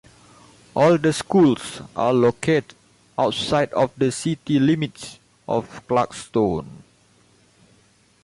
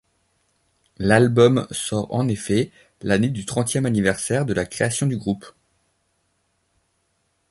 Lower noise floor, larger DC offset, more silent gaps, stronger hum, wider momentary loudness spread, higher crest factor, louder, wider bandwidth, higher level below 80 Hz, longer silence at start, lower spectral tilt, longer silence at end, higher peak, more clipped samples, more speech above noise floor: second, -58 dBFS vs -69 dBFS; neither; neither; first, 60 Hz at -50 dBFS vs none; first, 13 LU vs 10 LU; second, 16 dB vs 22 dB; about the same, -21 LUFS vs -21 LUFS; about the same, 11.5 kHz vs 11.5 kHz; about the same, -54 dBFS vs -50 dBFS; second, 0.75 s vs 1 s; about the same, -6 dB/octave vs -5.5 dB/octave; second, 1.45 s vs 2 s; second, -6 dBFS vs -2 dBFS; neither; second, 38 dB vs 49 dB